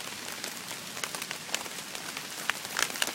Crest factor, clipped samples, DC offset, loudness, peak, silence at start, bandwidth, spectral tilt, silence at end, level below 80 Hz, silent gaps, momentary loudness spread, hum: 32 dB; under 0.1%; under 0.1%; -34 LUFS; -4 dBFS; 0 s; 17 kHz; 0 dB/octave; 0 s; -72 dBFS; none; 6 LU; none